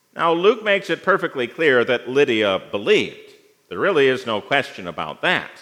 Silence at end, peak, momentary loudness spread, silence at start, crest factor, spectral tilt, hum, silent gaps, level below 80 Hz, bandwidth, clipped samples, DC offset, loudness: 0.1 s; -2 dBFS; 9 LU; 0.15 s; 18 dB; -5 dB/octave; none; none; -70 dBFS; 12 kHz; under 0.1%; under 0.1%; -19 LUFS